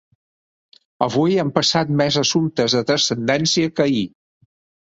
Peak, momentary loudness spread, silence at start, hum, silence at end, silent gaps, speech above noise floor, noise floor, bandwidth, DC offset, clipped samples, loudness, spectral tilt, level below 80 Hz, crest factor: 0 dBFS; 4 LU; 1 s; none; 0.75 s; none; over 72 dB; under -90 dBFS; 8 kHz; under 0.1%; under 0.1%; -18 LUFS; -4 dB/octave; -58 dBFS; 20 dB